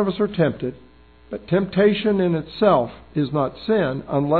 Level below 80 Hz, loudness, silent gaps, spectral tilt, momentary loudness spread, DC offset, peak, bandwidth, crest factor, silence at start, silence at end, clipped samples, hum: -50 dBFS; -21 LUFS; none; -10.5 dB/octave; 10 LU; 0.2%; -4 dBFS; 4.6 kHz; 16 dB; 0 s; 0 s; under 0.1%; none